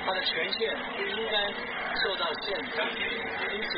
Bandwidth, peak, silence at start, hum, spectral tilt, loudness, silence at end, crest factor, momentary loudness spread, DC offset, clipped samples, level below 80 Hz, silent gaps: 5.2 kHz; -16 dBFS; 0 s; none; 0.5 dB/octave; -29 LUFS; 0 s; 16 dB; 4 LU; under 0.1%; under 0.1%; -58 dBFS; none